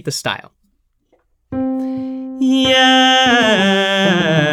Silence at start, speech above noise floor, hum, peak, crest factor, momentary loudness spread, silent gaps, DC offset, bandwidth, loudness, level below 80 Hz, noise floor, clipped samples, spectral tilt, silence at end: 0.05 s; 49 dB; none; 0 dBFS; 14 dB; 14 LU; none; under 0.1%; 14 kHz; -13 LUFS; -52 dBFS; -62 dBFS; under 0.1%; -4 dB/octave; 0 s